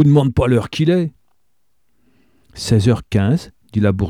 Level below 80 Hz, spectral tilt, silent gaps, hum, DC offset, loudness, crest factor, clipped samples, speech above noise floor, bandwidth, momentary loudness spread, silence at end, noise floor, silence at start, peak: -38 dBFS; -7.5 dB/octave; none; none; 0.2%; -17 LUFS; 14 dB; under 0.1%; 56 dB; 13 kHz; 9 LU; 0 s; -71 dBFS; 0 s; -2 dBFS